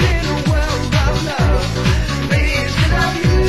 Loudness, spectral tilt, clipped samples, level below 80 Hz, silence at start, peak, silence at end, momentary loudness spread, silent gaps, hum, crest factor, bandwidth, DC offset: -16 LUFS; -5.5 dB/octave; under 0.1%; -20 dBFS; 0 s; -2 dBFS; 0 s; 2 LU; none; none; 12 dB; 12.5 kHz; 2%